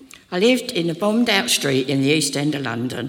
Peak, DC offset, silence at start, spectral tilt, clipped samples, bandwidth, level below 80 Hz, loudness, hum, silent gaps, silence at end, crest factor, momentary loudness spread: -2 dBFS; under 0.1%; 0 s; -4 dB/octave; under 0.1%; 18 kHz; -64 dBFS; -19 LUFS; none; none; 0 s; 18 dB; 7 LU